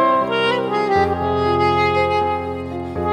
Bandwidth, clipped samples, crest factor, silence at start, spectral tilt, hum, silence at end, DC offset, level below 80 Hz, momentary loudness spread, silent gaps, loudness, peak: 11 kHz; under 0.1%; 14 dB; 0 s; -6.5 dB/octave; none; 0 s; under 0.1%; -42 dBFS; 8 LU; none; -18 LUFS; -4 dBFS